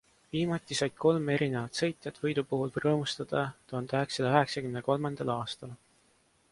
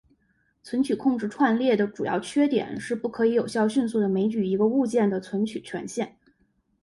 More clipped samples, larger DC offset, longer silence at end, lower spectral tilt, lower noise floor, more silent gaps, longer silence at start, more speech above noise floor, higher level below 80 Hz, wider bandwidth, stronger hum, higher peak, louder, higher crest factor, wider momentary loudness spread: neither; neither; about the same, 0.75 s vs 0.75 s; about the same, -5.5 dB/octave vs -6 dB/octave; about the same, -68 dBFS vs -69 dBFS; neither; second, 0.35 s vs 0.65 s; second, 37 dB vs 44 dB; about the same, -66 dBFS vs -66 dBFS; about the same, 11.5 kHz vs 11.5 kHz; neither; about the same, -10 dBFS vs -8 dBFS; second, -31 LUFS vs -25 LUFS; first, 22 dB vs 16 dB; about the same, 8 LU vs 9 LU